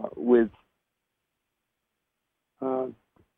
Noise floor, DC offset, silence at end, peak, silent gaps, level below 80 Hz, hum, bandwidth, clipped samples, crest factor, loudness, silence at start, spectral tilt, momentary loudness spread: -82 dBFS; under 0.1%; 0.45 s; -8 dBFS; none; -64 dBFS; none; 3.8 kHz; under 0.1%; 22 dB; -26 LUFS; 0 s; -9.5 dB/octave; 13 LU